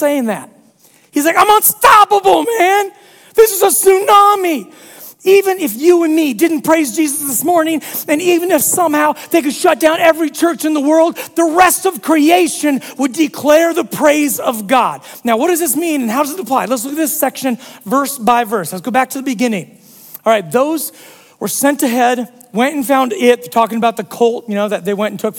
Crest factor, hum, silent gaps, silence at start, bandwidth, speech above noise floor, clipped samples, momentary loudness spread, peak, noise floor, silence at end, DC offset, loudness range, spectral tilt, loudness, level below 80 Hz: 14 dB; none; none; 0 s; 18.5 kHz; 36 dB; under 0.1%; 9 LU; 0 dBFS; -49 dBFS; 0 s; under 0.1%; 5 LU; -3 dB/octave; -13 LUFS; -56 dBFS